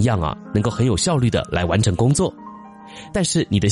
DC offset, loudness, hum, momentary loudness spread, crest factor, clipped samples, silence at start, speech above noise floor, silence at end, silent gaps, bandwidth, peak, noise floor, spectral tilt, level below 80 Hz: under 0.1%; -20 LUFS; none; 21 LU; 14 dB; under 0.1%; 0 s; 20 dB; 0 s; none; 11.5 kHz; -6 dBFS; -39 dBFS; -5.5 dB/octave; -38 dBFS